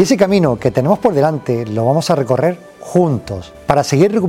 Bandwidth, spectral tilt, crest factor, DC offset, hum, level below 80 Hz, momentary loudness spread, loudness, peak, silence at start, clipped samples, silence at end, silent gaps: 16.5 kHz; -6.5 dB/octave; 14 dB; under 0.1%; none; -44 dBFS; 8 LU; -15 LUFS; 0 dBFS; 0 s; under 0.1%; 0 s; none